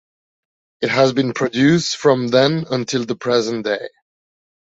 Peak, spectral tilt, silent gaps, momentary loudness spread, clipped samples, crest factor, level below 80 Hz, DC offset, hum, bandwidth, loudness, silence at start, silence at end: -2 dBFS; -5 dB/octave; none; 8 LU; under 0.1%; 16 dB; -60 dBFS; under 0.1%; none; 8 kHz; -17 LUFS; 0.8 s; 0.8 s